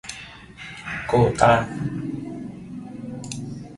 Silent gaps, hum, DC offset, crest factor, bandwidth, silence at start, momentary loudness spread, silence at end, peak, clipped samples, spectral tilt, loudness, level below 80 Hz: none; none; under 0.1%; 24 dB; 11.5 kHz; 0.05 s; 20 LU; 0 s; 0 dBFS; under 0.1%; -6 dB/octave; -23 LUFS; -46 dBFS